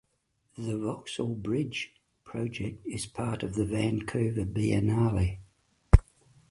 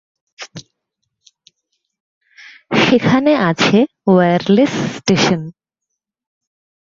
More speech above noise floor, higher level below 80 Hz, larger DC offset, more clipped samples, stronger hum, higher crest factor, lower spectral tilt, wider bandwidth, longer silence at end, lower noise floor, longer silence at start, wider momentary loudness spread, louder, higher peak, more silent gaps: second, 44 dB vs 65 dB; first, -34 dBFS vs -54 dBFS; neither; neither; neither; first, 28 dB vs 16 dB; about the same, -6.5 dB/octave vs -5.5 dB/octave; first, 11.5 kHz vs 7.6 kHz; second, 0.5 s vs 1.3 s; second, -74 dBFS vs -79 dBFS; first, 0.6 s vs 0.4 s; second, 12 LU vs 20 LU; second, -30 LUFS vs -14 LUFS; about the same, 0 dBFS vs 0 dBFS; second, none vs 2.00-2.21 s